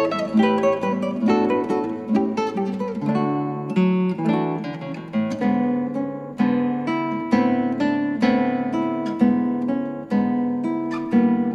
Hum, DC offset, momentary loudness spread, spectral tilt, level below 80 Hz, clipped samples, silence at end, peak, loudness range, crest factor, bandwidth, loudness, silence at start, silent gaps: none; under 0.1%; 6 LU; -8 dB/octave; -62 dBFS; under 0.1%; 0 s; -6 dBFS; 2 LU; 16 dB; 7.8 kHz; -22 LUFS; 0 s; none